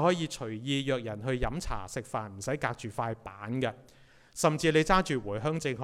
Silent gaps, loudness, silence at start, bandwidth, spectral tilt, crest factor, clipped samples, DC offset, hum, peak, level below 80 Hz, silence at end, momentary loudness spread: none; -31 LUFS; 0 s; 15.5 kHz; -5 dB/octave; 22 dB; under 0.1%; under 0.1%; none; -10 dBFS; -46 dBFS; 0 s; 11 LU